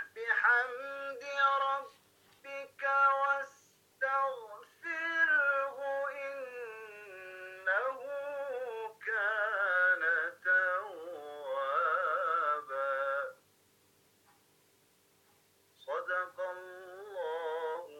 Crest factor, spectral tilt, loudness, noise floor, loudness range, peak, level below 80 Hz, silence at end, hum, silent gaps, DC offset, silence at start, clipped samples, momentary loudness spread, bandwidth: 18 dB; -1.5 dB/octave; -32 LUFS; -69 dBFS; 10 LU; -16 dBFS; under -90 dBFS; 0 s; none; none; under 0.1%; 0 s; under 0.1%; 18 LU; 17 kHz